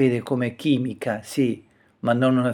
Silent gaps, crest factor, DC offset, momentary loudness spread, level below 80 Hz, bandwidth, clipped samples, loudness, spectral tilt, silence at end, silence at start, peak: none; 16 dB; under 0.1%; 9 LU; -64 dBFS; 16.5 kHz; under 0.1%; -23 LUFS; -7 dB/octave; 0 s; 0 s; -6 dBFS